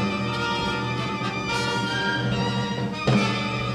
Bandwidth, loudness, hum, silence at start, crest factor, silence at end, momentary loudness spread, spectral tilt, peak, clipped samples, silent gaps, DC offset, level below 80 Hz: 13 kHz; -25 LUFS; none; 0 s; 16 dB; 0 s; 5 LU; -5 dB/octave; -10 dBFS; under 0.1%; none; under 0.1%; -46 dBFS